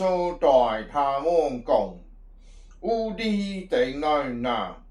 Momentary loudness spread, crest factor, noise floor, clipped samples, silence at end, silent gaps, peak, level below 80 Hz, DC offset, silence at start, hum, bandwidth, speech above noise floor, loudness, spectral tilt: 8 LU; 18 dB; -47 dBFS; under 0.1%; 0.1 s; none; -6 dBFS; -46 dBFS; under 0.1%; 0 s; none; 11 kHz; 23 dB; -25 LUFS; -6 dB/octave